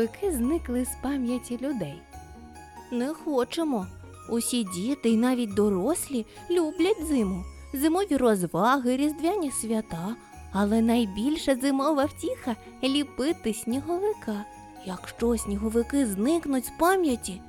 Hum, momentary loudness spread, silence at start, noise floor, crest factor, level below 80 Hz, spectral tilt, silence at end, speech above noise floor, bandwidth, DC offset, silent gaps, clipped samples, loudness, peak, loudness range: none; 13 LU; 0 s; -46 dBFS; 18 dB; -48 dBFS; -5 dB/octave; 0 s; 19 dB; 17.5 kHz; under 0.1%; none; under 0.1%; -27 LUFS; -10 dBFS; 5 LU